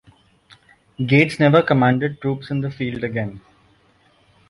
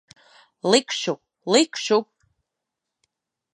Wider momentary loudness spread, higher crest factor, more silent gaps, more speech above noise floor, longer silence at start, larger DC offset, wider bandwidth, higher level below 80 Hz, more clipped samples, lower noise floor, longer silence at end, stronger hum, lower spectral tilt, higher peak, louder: about the same, 12 LU vs 10 LU; about the same, 18 dB vs 22 dB; neither; second, 39 dB vs 63 dB; first, 1 s vs 0.65 s; neither; about the same, 11.5 kHz vs 11 kHz; first, -54 dBFS vs -78 dBFS; neither; second, -57 dBFS vs -84 dBFS; second, 1.1 s vs 1.5 s; neither; first, -7.5 dB/octave vs -3 dB/octave; about the same, -2 dBFS vs -4 dBFS; first, -19 LUFS vs -22 LUFS